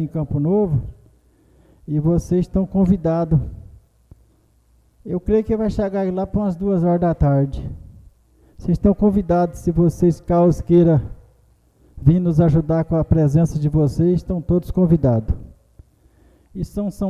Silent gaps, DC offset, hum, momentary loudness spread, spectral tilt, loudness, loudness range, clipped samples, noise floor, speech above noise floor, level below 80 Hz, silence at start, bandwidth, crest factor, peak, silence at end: none; under 0.1%; none; 12 LU; -10 dB/octave; -18 LUFS; 4 LU; under 0.1%; -57 dBFS; 39 dB; -34 dBFS; 0 s; 11 kHz; 18 dB; -2 dBFS; 0 s